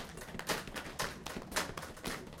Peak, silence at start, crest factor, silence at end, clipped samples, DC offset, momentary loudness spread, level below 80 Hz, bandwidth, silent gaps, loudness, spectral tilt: -20 dBFS; 0 s; 22 dB; 0 s; under 0.1%; under 0.1%; 5 LU; -54 dBFS; 17 kHz; none; -40 LUFS; -2.5 dB/octave